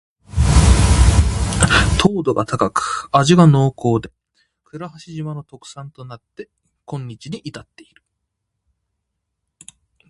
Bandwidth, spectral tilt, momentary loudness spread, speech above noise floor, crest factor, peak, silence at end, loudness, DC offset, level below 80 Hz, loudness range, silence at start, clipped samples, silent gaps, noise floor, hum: 11.5 kHz; -5.5 dB/octave; 23 LU; 57 dB; 18 dB; 0 dBFS; 2.5 s; -15 LUFS; under 0.1%; -24 dBFS; 21 LU; 0.35 s; under 0.1%; none; -76 dBFS; none